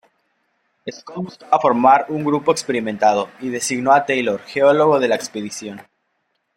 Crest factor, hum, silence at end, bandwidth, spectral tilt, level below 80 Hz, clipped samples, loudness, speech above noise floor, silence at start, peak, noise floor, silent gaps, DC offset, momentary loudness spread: 18 dB; none; 0.75 s; 16.5 kHz; -4.5 dB/octave; -64 dBFS; under 0.1%; -17 LUFS; 53 dB; 0.85 s; 0 dBFS; -70 dBFS; none; under 0.1%; 17 LU